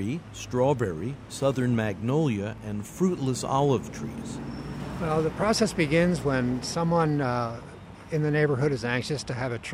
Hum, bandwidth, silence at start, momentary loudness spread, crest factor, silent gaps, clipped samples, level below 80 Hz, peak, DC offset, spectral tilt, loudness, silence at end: none; 15.5 kHz; 0 s; 12 LU; 16 dB; none; under 0.1%; -50 dBFS; -10 dBFS; under 0.1%; -6 dB/octave; -27 LUFS; 0 s